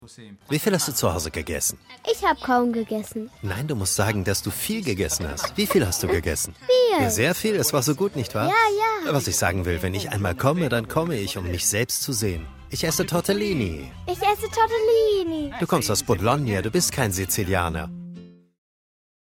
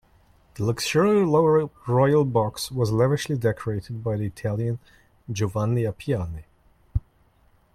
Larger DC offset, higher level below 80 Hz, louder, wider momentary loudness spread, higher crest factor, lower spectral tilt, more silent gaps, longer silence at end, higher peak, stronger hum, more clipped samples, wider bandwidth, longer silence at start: neither; about the same, -44 dBFS vs -44 dBFS; about the same, -23 LUFS vs -24 LUFS; second, 8 LU vs 13 LU; about the same, 20 dB vs 16 dB; second, -4 dB/octave vs -6.5 dB/octave; neither; first, 1.05 s vs 0.75 s; first, -4 dBFS vs -8 dBFS; neither; neither; first, 17.5 kHz vs 15 kHz; second, 0 s vs 0.55 s